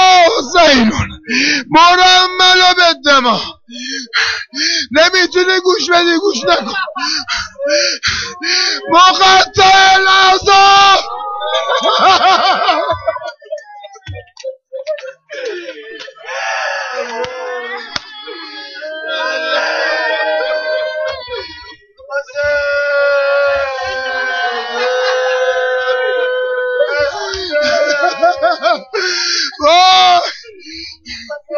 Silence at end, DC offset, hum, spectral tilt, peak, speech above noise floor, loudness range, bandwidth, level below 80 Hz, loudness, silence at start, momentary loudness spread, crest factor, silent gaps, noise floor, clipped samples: 0 s; under 0.1%; none; -2 dB/octave; -2 dBFS; 26 dB; 13 LU; 7.4 kHz; -44 dBFS; -11 LUFS; 0 s; 20 LU; 12 dB; none; -36 dBFS; under 0.1%